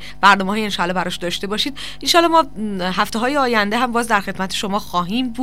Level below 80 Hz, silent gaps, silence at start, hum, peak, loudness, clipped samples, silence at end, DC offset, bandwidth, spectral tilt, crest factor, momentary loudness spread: -44 dBFS; none; 0 s; 50 Hz at -45 dBFS; 0 dBFS; -18 LUFS; under 0.1%; 0 s; 3%; 16 kHz; -3.5 dB/octave; 18 dB; 9 LU